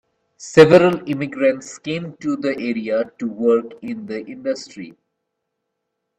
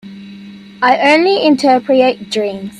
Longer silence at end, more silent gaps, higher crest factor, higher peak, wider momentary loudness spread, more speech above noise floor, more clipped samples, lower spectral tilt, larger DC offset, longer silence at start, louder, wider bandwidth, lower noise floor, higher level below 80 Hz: first, 1.3 s vs 0 s; neither; first, 20 dB vs 14 dB; about the same, 0 dBFS vs 0 dBFS; first, 19 LU vs 9 LU; first, 59 dB vs 22 dB; neither; first, -6 dB/octave vs -4.5 dB/octave; neither; first, 0.4 s vs 0.05 s; second, -18 LUFS vs -12 LUFS; second, 9.8 kHz vs 12 kHz; first, -77 dBFS vs -34 dBFS; about the same, -60 dBFS vs -58 dBFS